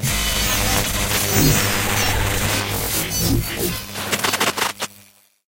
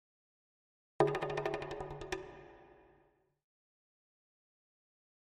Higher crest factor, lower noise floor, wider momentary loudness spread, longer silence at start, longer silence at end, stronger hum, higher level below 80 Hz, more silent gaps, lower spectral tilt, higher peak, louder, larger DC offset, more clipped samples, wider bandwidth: second, 20 dB vs 30 dB; second, -51 dBFS vs -72 dBFS; second, 7 LU vs 21 LU; second, 0 s vs 1 s; second, 0.45 s vs 2.55 s; first, 50 Hz at -30 dBFS vs none; first, -30 dBFS vs -64 dBFS; neither; second, -3 dB/octave vs -6 dB/octave; first, 0 dBFS vs -14 dBFS; first, -19 LUFS vs -38 LUFS; neither; neither; first, 17 kHz vs 11 kHz